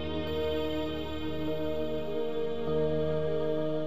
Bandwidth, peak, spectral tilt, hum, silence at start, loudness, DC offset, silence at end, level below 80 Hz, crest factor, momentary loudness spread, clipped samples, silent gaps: 14.5 kHz; -18 dBFS; -7.5 dB/octave; none; 0 s; -32 LUFS; 2%; 0 s; -50 dBFS; 12 dB; 5 LU; under 0.1%; none